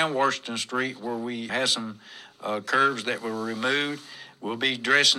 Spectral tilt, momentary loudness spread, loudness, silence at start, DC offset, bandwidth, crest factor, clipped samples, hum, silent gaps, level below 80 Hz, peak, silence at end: -2 dB/octave; 15 LU; -26 LUFS; 0 s; under 0.1%; 14.5 kHz; 22 dB; under 0.1%; none; none; -80 dBFS; -6 dBFS; 0 s